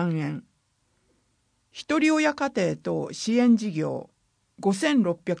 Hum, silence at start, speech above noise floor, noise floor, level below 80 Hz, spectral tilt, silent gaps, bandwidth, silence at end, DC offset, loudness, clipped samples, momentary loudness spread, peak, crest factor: none; 0 s; 46 dB; -70 dBFS; -68 dBFS; -5.5 dB/octave; none; 10.5 kHz; 0 s; under 0.1%; -25 LUFS; under 0.1%; 13 LU; -10 dBFS; 16 dB